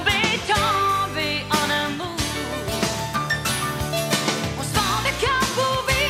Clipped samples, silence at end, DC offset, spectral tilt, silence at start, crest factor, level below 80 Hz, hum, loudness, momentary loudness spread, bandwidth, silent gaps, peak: under 0.1%; 0 s; under 0.1%; -3 dB/octave; 0 s; 16 dB; -40 dBFS; none; -22 LUFS; 6 LU; 16 kHz; none; -6 dBFS